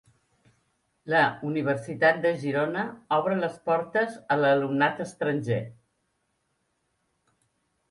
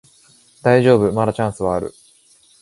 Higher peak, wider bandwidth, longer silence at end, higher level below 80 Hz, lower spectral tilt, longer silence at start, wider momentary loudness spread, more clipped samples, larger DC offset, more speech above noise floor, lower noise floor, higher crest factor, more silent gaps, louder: second, -8 dBFS vs 0 dBFS; about the same, 11.5 kHz vs 11.5 kHz; first, 2.15 s vs 0.7 s; second, -70 dBFS vs -48 dBFS; about the same, -6.5 dB/octave vs -7 dB/octave; first, 1.05 s vs 0.65 s; second, 7 LU vs 10 LU; neither; neither; first, 49 dB vs 37 dB; first, -75 dBFS vs -53 dBFS; about the same, 20 dB vs 18 dB; neither; second, -26 LUFS vs -17 LUFS